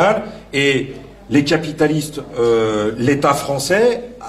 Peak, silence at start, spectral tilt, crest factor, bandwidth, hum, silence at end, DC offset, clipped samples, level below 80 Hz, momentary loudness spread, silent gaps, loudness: -2 dBFS; 0 s; -5 dB/octave; 14 dB; 15 kHz; none; 0 s; under 0.1%; under 0.1%; -46 dBFS; 7 LU; none; -17 LUFS